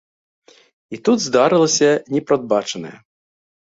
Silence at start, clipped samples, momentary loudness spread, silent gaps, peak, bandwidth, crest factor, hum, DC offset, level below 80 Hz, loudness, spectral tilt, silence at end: 0.9 s; under 0.1%; 16 LU; none; -2 dBFS; 8 kHz; 18 dB; none; under 0.1%; -62 dBFS; -17 LUFS; -4 dB/octave; 0.7 s